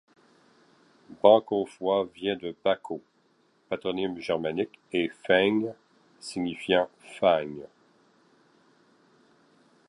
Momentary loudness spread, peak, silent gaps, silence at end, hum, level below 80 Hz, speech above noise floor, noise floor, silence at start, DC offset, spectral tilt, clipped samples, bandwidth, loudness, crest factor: 14 LU; -4 dBFS; none; 2.25 s; none; -68 dBFS; 40 dB; -66 dBFS; 1.1 s; under 0.1%; -5.5 dB/octave; under 0.1%; 11.5 kHz; -27 LUFS; 26 dB